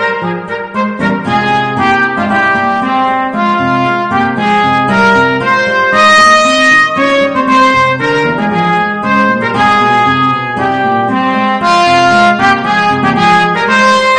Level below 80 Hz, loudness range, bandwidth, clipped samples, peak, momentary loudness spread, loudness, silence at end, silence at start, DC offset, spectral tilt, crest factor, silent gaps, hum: -46 dBFS; 4 LU; 11 kHz; 0.3%; 0 dBFS; 6 LU; -9 LUFS; 0 s; 0 s; under 0.1%; -4.5 dB/octave; 10 dB; none; none